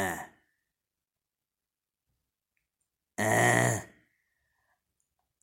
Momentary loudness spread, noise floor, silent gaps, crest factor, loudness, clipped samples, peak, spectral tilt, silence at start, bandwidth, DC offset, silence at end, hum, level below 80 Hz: 17 LU; under -90 dBFS; none; 26 dB; -27 LUFS; under 0.1%; -10 dBFS; -4 dB/octave; 0 s; 16.5 kHz; under 0.1%; 1.55 s; none; -68 dBFS